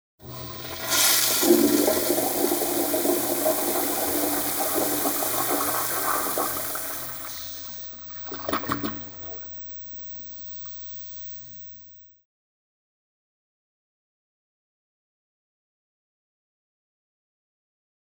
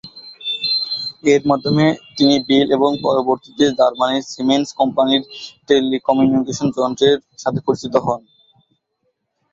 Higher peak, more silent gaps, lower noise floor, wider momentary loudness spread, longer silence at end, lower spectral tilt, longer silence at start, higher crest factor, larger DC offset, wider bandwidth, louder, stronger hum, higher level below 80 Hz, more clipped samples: second, -6 dBFS vs -2 dBFS; neither; second, -49 dBFS vs -70 dBFS; first, 16 LU vs 7 LU; first, 6.05 s vs 1.35 s; second, -2 dB/octave vs -5 dB/octave; first, 0.2 s vs 0.05 s; first, 22 dB vs 16 dB; neither; first, over 20 kHz vs 7.8 kHz; second, -24 LUFS vs -17 LUFS; neither; about the same, -60 dBFS vs -56 dBFS; neither